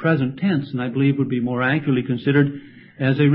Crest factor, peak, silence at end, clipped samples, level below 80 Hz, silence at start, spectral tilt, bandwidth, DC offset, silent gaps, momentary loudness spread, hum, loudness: 14 dB; -4 dBFS; 0 s; under 0.1%; -60 dBFS; 0 s; -12.5 dB/octave; 5 kHz; under 0.1%; none; 5 LU; none; -21 LUFS